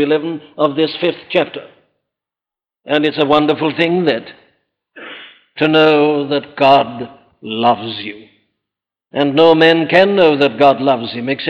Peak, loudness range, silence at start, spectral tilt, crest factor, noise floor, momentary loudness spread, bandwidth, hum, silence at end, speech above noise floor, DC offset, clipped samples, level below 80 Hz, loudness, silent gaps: 0 dBFS; 5 LU; 0 s; -7 dB/octave; 14 dB; -89 dBFS; 19 LU; 7.4 kHz; none; 0 s; 75 dB; under 0.1%; under 0.1%; -58 dBFS; -13 LUFS; none